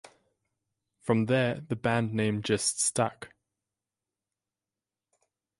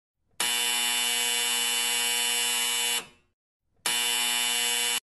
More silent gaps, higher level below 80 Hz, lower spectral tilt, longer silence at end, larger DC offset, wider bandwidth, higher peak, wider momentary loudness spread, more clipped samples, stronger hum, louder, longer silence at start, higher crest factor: second, none vs 3.33-3.60 s; first, -64 dBFS vs -72 dBFS; first, -4.5 dB/octave vs 2.5 dB/octave; first, 2.35 s vs 0.05 s; neither; about the same, 11.5 kHz vs 12.5 kHz; about the same, -12 dBFS vs -12 dBFS; first, 10 LU vs 4 LU; neither; neither; second, -28 LUFS vs -24 LUFS; first, 1.05 s vs 0.4 s; about the same, 20 dB vs 16 dB